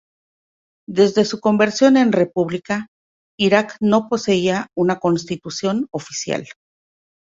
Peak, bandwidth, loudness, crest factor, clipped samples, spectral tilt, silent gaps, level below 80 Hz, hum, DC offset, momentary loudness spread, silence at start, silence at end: -2 dBFS; 7.8 kHz; -18 LUFS; 18 dB; under 0.1%; -5 dB/octave; 2.88-3.38 s; -60 dBFS; none; under 0.1%; 11 LU; 0.9 s; 0.85 s